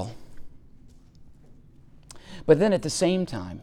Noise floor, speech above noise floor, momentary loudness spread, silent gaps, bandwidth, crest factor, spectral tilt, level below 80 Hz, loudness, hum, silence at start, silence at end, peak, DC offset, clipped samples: -50 dBFS; 28 dB; 17 LU; none; 13.5 kHz; 22 dB; -5.5 dB/octave; -50 dBFS; -23 LUFS; none; 0 s; 0 s; -6 dBFS; under 0.1%; under 0.1%